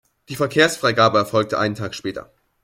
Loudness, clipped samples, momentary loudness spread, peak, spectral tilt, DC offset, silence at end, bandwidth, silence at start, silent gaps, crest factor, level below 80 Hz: -19 LUFS; under 0.1%; 14 LU; -2 dBFS; -4.5 dB/octave; under 0.1%; 0.4 s; 16.5 kHz; 0.3 s; none; 18 dB; -58 dBFS